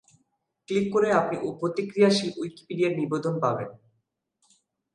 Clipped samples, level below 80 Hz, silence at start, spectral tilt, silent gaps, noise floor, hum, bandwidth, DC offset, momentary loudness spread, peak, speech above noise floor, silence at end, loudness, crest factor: under 0.1%; -70 dBFS; 0.7 s; -6 dB/octave; none; -76 dBFS; none; 11 kHz; under 0.1%; 11 LU; -8 dBFS; 51 dB; 1.2 s; -26 LUFS; 18 dB